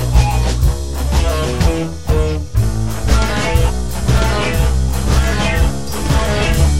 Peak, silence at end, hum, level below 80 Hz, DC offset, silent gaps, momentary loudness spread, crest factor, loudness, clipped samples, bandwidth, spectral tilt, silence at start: 0 dBFS; 0 s; none; -16 dBFS; 6%; none; 4 LU; 14 dB; -16 LUFS; under 0.1%; 16 kHz; -5.5 dB/octave; 0 s